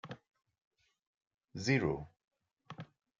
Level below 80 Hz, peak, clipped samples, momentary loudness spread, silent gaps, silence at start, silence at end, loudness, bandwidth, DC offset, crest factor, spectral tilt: -66 dBFS; -16 dBFS; under 0.1%; 22 LU; 0.67-0.71 s, 1.07-1.21 s, 1.27-1.38 s, 2.24-2.28 s; 0.05 s; 0.35 s; -35 LUFS; 7.6 kHz; under 0.1%; 24 dB; -6 dB/octave